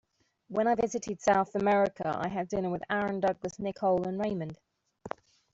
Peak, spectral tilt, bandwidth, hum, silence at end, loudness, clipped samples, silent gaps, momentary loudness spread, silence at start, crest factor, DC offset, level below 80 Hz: -14 dBFS; -6 dB/octave; 8 kHz; none; 0.45 s; -30 LUFS; under 0.1%; none; 16 LU; 0.5 s; 18 dB; under 0.1%; -62 dBFS